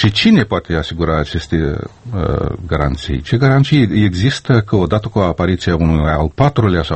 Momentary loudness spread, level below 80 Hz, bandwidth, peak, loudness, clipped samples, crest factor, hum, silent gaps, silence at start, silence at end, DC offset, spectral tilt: 8 LU; -28 dBFS; 8.6 kHz; 0 dBFS; -15 LUFS; under 0.1%; 14 dB; none; none; 0 s; 0 s; under 0.1%; -7 dB/octave